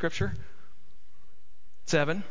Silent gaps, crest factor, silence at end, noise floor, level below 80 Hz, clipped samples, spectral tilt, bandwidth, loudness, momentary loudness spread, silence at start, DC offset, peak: none; 22 dB; 0 s; -64 dBFS; -50 dBFS; under 0.1%; -5 dB/octave; 7.8 kHz; -29 LUFS; 19 LU; 0 s; 3%; -12 dBFS